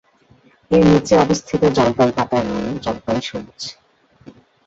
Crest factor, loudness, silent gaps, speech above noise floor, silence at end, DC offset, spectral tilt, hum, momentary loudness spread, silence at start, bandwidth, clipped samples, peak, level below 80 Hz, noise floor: 16 dB; -17 LUFS; none; 36 dB; 0.95 s; under 0.1%; -6 dB/octave; none; 16 LU; 0.7 s; 8 kHz; under 0.1%; -2 dBFS; -44 dBFS; -53 dBFS